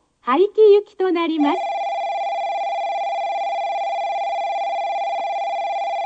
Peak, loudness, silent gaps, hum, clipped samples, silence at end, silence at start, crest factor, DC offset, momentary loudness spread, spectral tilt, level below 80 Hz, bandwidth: -4 dBFS; -20 LUFS; none; none; under 0.1%; 0 s; 0.25 s; 16 dB; under 0.1%; 9 LU; -3.5 dB/octave; -72 dBFS; 8 kHz